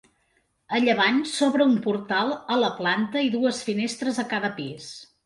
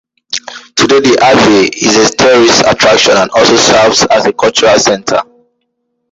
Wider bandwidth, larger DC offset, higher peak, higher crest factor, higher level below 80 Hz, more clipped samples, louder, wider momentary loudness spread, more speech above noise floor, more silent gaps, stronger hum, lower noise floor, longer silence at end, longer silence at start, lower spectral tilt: about the same, 11.5 kHz vs 11.5 kHz; neither; second, -8 dBFS vs 0 dBFS; first, 16 dB vs 8 dB; second, -68 dBFS vs -42 dBFS; second, under 0.1% vs 0.1%; second, -24 LUFS vs -7 LUFS; about the same, 9 LU vs 10 LU; second, 45 dB vs 58 dB; neither; neither; first, -69 dBFS vs -65 dBFS; second, 0.2 s vs 0.9 s; first, 0.7 s vs 0.3 s; first, -4 dB/octave vs -2.5 dB/octave